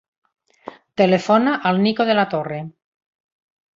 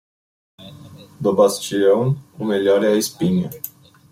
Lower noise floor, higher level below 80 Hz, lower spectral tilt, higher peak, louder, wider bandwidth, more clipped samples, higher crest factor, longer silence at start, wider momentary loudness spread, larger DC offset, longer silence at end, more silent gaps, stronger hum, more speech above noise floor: about the same, -40 dBFS vs -41 dBFS; about the same, -64 dBFS vs -60 dBFS; about the same, -6.5 dB/octave vs -5.5 dB/octave; about the same, -2 dBFS vs -2 dBFS; about the same, -18 LUFS vs -18 LUFS; second, 7.6 kHz vs 16.5 kHz; neither; about the same, 18 dB vs 18 dB; about the same, 0.65 s vs 0.6 s; about the same, 15 LU vs 13 LU; neither; first, 1.1 s vs 0.45 s; neither; neither; about the same, 23 dB vs 24 dB